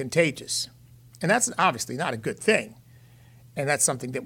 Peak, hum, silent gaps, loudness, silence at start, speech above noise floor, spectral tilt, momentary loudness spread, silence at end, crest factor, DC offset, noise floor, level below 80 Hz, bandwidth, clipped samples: -8 dBFS; none; none; -25 LUFS; 0 s; 27 dB; -3 dB/octave; 9 LU; 0 s; 20 dB; under 0.1%; -52 dBFS; -64 dBFS; 18 kHz; under 0.1%